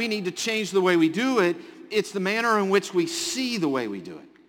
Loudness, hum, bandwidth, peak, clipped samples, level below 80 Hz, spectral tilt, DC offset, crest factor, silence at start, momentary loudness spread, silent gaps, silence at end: -24 LUFS; none; 17 kHz; -8 dBFS; under 0.1%; -72 dBFS; -4 dB/octave; under 0.1%; 16 dB; 0 s; 8 LU; none; 0.25 s